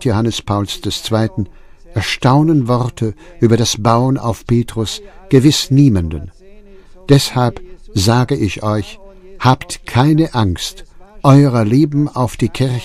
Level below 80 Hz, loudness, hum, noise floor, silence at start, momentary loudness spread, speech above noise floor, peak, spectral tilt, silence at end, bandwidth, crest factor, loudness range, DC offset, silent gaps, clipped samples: -36 dBFS; -14 LUFS; none; -38 dBFS; 0 s; 12 LU; 25 dB; 0 dBFS; -6 dB/octave; 0 s; 14.5 kHz; 14 dB; 3 LU; under 0.1%; none; under 0.1%